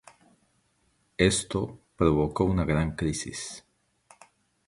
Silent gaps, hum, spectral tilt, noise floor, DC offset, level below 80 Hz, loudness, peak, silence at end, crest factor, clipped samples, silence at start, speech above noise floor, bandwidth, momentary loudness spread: none; none; -5 dB/octave; -70 dBFS; under 0.1%; -44 dBFS; -27 LUFS; -6 dBFS; 1.1 s; 24 dB; under 0.1%; 1.2 s; 44 dB; 11.5 kHz; 14 LU